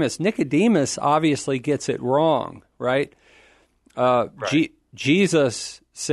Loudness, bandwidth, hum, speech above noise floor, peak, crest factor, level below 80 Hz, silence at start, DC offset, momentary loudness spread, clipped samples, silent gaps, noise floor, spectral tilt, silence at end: -21 LUFS; 12 kHz; none; 37 dB; -6 dBFS; 16 dB; -60 dBFS; 0 s; under 0.1%; 12 LU; under 0.1%; none; -57 dBFS; -5 dB/octave; 0 s